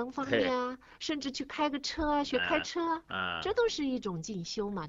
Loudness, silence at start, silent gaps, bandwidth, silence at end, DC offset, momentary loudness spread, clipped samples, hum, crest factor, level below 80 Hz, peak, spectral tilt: -33 LUFS; 0 s; none; 8 kHz; 0 s; under 0.1%; 7 LU; under 0.1%; none; 18 dB; -54 dBFS; -14 dBFS; -4 dB/octave